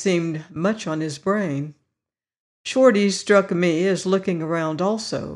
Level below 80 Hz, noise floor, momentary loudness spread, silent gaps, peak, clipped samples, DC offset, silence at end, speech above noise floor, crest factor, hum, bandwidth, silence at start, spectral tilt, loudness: -64 dBFS; -86 dBFS; 10 LU; 2.40-2.64 s; -4 dBFS; under 0.1%; under 0.1%; 0 s; 66 dB; 18 dB; none; 11.5 kHz; 0 s; -5.5 dB/octave; -21 LUFS